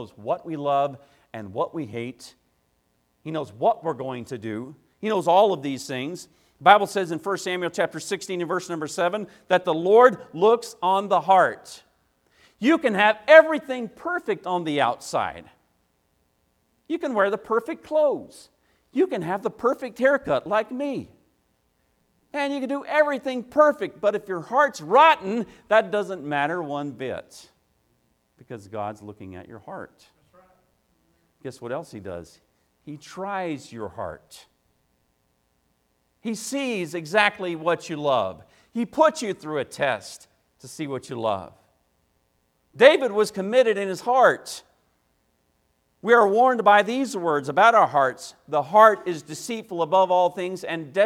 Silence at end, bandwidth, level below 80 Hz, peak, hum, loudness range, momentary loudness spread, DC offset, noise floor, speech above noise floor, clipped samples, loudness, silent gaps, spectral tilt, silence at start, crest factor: 0 s; 15.5 kHz; -68 dBFS; 0 dBFS; none; 16 LU; 19 LU; under 0.1%; -69 dBFS; 47 dB; under 0.1%; -22 LUFS; none; -4.5 dB/octave; 0 s; 24 dB